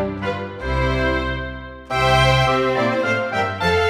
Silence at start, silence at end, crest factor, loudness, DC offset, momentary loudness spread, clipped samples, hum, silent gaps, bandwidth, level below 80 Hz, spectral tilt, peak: 0 s; 0 s; 16 dB; -19 LUFS; under 0.1%; 11 LU; under 0.1%; none; none; 15 kHz; -32 dBFS; -5.5 dB/octave; -2 dBFS